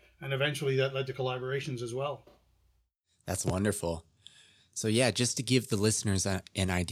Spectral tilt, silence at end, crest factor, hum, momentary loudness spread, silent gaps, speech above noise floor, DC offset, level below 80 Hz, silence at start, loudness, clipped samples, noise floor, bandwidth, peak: -4 dB/octave; 0 s; 20 dB; none; 10 LU; none; 43 dB; under 0.1%; -62 dBFS; 0.2 s; -31 LUFS; under 0.1%; -74 dBFS; 15 kHz; -12 dBFS